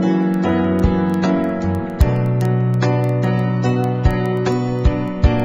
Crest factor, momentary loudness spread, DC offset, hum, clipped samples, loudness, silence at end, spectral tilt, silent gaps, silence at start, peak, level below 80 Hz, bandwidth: 16 dB; 2 LU; under 0.1%; none; under 0.1%; -18 LUFS; 0 s; -8.5 dB/octave; none; 0 s; 0 dBFS; -26 dBFS; 11.5 kHz